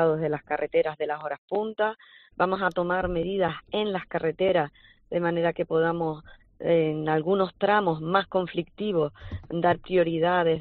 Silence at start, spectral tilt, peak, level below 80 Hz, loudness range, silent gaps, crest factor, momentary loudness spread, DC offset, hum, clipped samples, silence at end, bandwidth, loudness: 0 s; -4.5 dB/octave; -8 dBFS; -52 dBFS; 2 LU; 1.38-1.48 s; 18 dB; 9 LU; under 0.1%; none; under 0.1%; 0 s; 4.5 kHz; -26 LUFS